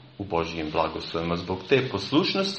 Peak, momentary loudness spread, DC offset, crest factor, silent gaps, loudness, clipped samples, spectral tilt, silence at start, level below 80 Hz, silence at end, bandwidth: -8 dBFS; 7 LU; under 0.1%; 20 dB; none; -26 LUFS; under 0.1%; -5.5 dB/octave; 0 s; -52 dBFS; 0 s; 8.4 kHz